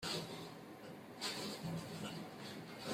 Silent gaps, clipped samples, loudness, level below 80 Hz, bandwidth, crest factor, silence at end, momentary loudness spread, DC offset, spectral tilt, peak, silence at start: none; under 0.1%; -46 LUFS; -76 dBFS; 16 kHz; 18 dB; 0 s; 11 LU; under 0.1%; -4 dB/octave; -28 dBFS; 0 s